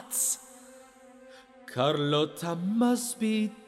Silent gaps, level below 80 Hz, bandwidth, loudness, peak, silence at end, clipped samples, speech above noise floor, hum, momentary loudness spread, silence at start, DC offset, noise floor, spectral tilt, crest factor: none; -76 dBFS; 16.5 kHz; -28 LUFS; -12 dBFS; 0.05 s; under 0.1%; 25 dB; none; 11 LU; 0 s; under 0.1%; -53 dBFS; -4 dB/octave; 18 dB